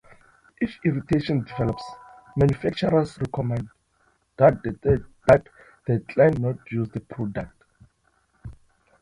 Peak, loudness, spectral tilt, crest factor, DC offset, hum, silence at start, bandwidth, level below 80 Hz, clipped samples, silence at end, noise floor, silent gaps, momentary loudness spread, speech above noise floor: -4 dBFS; -24 LUFS; -8.5 dB/octave; 22 dB; under 0.1%; none; 0.6 s; 11 kHz; -46 dBFS; under 0.1%; 0.5 s; -67 dBFS; none; 16 LU; 44 dB